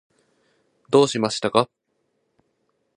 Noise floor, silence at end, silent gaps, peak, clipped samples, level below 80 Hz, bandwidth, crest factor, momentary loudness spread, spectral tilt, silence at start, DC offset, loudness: -72 dBFS; 1.3 s; none; -2 dBFS; under 0.1%; -66 dBFS; 11.5 kHz; 24 dB; 5 LU; -4.5 dB/octave; 0.9 s; under 0.1%; -21 LUFS